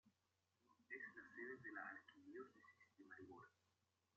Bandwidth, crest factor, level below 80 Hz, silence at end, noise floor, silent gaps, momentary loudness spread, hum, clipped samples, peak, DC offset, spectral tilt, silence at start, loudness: 7 kHz; 20 dB; under -90 dBFS; 0.65 s; -89 dBFS; none; 10 LU; none; under 0.1%; -40 dBFS; under 0.1%; -3.5 dB/octave; 0.05 s; -58 LUFS